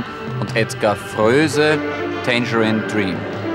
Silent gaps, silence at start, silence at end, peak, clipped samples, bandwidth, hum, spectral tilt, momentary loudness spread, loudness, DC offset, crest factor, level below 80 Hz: none; 0 s; 0 s; -4 dBFS; under 0.1%; 16 kHz; none; -5.5 dB/octave; 8 LU; -18 LUFS; under 0.1%; 16 dB; -54 dBFS